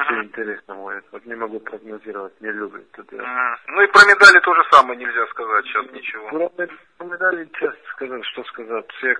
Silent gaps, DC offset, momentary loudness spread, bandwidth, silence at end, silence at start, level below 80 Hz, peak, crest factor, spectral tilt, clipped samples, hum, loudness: none; under 0.1%; 24 LU; 11 kHz; 0 s; 0 s; -62 dBFS; 0 dBFS; 18 dB; -1.5 dB/octave; 0.2%; none; -14 LUFS